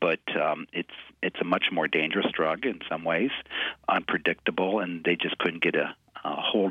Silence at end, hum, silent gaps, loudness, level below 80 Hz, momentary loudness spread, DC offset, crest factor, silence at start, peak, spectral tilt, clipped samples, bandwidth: 0 s; none; none; -27 LUFS; -66 dBFS; 8 LU; under 0.1%; 18 dB; 0 s; -10 dBFS; -6.5 dB/octave; under 0.1%; 8.2 kHz